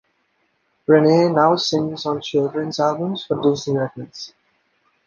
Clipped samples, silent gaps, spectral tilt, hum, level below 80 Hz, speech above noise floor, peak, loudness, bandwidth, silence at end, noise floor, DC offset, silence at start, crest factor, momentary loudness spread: under 0.1%; none; -6 dB/octave; none; -62 dBFS; 48 dB; -2 dBFS; -19 LUFS; 7.2 kHz; 0.8 s; -67 dBFS; under 0.1%; 0.9 s; 18 dB; 17 LU